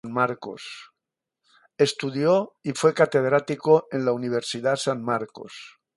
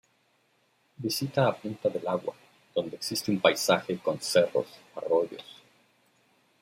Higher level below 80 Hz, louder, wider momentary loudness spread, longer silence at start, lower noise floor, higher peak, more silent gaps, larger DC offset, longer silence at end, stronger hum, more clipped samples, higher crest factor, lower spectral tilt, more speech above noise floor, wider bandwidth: about the same, -70 dBFS vs -74 dBFS; first, -23 LUFS vs -29 LUFS; first, 17 LU vs 13 LU; second, 0.05 s vs 1 s; first, -86 dBFS vs -69 dBFS; about the same, -4 dBFS vs -4 dBFS; neither; neither; second, 0.3 s vs 1.1 s; neither; neither; second, 20 dB vs 26 dB; about the same, -5 dB/octave vs -4 dB/octave; first, 62 dB vs 41 dB; second, 11.5 kHz vs 16 kHz